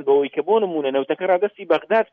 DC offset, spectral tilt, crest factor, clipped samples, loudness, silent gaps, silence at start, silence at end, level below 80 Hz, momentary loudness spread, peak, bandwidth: under 0.1%; -7.5 dB/octave; 14 dB; under 0.1%; -20 LUFS; none; 0 s; 0.1 s; -74 dBFS; 3 LU; -6 dBFS; 4.5 kHz